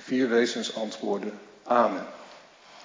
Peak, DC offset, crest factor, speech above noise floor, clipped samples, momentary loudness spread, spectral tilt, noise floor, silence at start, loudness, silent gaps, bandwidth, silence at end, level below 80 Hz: -8 dBFS; under 0.1%; 20 dB; 24 dB; under 0.1%; 18 LU; -4 dB/octave; -51 dBFS; 0 s; -27 LUFS; none; 7.6 kHz; 0 s; -82 dBFS